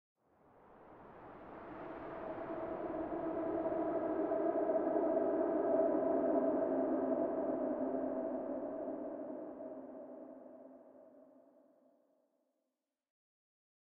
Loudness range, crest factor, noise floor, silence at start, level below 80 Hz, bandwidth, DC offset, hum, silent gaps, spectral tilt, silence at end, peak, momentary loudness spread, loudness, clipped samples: 16 LU; 18 dB; -89 dBFS; 0.7 s; -72 dBFS; 3.8 kHz; under 0.1%; none; none; -7.5 dB/octave; 2.75 s; -20 dBFS; 19 LU; -37 LUFS; under 0.1%